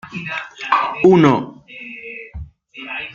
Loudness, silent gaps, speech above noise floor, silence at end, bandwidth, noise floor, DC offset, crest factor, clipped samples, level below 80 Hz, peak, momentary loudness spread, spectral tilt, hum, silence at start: -16 LUFS; none; 20 dB; 0 s; 7.2 kHz; -35 dBFS; under 0.1%; 16 dB; under 0.1%; -46 dBFS; -2 dBFS; 23 LU; -7 dB/octave; none; 0.05 s